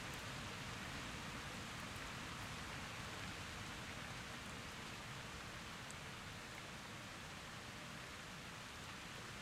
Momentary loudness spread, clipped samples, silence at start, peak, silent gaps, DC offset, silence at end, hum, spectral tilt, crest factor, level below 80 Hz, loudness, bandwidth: 3 LU; under 0.1%; 0 s; -34 dBFS; none; under 0.1%; 0 s; none; -3 dB/octave; 16 dB; -64 dBFS; -49 LUFS; 16 kHz